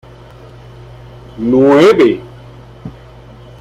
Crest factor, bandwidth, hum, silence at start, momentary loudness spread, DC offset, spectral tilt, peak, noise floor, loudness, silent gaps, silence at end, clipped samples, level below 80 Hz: 14 dB; 12 kHz; none; 1.35 s; 25 LU; under 0.1%; -6.5 dB/octave; 0 dBFS; -36 dBFS; -10 LUFS; none; 0.7 s; under 0.1%; -42 dBFS